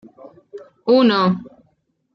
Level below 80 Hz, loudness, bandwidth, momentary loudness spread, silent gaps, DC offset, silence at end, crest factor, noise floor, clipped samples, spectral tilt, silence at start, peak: -64 dBFS; -17 LUFS; 6.2 kHz; 15 LU; none; under 0.1%; 0.65 s; 16 dB; -64 dBFS; under 0.1%; -8 dB/octave; 0.25 s; -4 dBFS